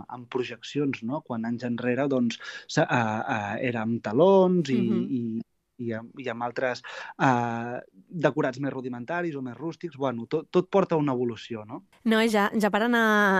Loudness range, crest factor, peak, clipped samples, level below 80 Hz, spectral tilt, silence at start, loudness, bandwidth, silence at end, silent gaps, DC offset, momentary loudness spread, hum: 5 LU; 18 dB; -8 dBFS; under 0.1%; -72 dBFS; -6 dB/octave; 0 s; -26 LUFS; 15 kHz; 0 s; none; under 0.1%; 13 LU; none